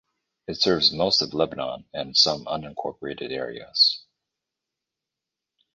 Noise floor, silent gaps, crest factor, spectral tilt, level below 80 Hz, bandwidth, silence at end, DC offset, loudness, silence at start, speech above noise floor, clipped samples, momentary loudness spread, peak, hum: -87 dBFS; none; 22 dB; -3.5 dB/octave; -58 dBFS; 10 kHz; 1.75 s; under 0.1%; -22 LUFS; 0.5 s; 62 dB; under 0.1%; 14 LU; -4 dBFS; none